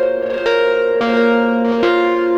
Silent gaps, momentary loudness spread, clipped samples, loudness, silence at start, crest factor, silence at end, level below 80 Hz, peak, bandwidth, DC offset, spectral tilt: none; 3 LU; under 0.1%; -15 LUFS; 0 s; 12 dB; 0 s; -52 dBFS; -4 dBFS; 7.8 kHz; under 0.1%; -5.5 dB/octave